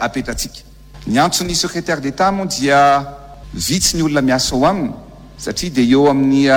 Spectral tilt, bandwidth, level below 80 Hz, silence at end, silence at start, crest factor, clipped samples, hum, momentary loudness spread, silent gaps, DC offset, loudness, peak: -4 dB/octave; 17.5 kHz; -36 dBFS; 0 s; 0 s; 14 dB; under 0.1%; none; 14 LU; none; under 0.1%; -15 LUFS; -2 dBFS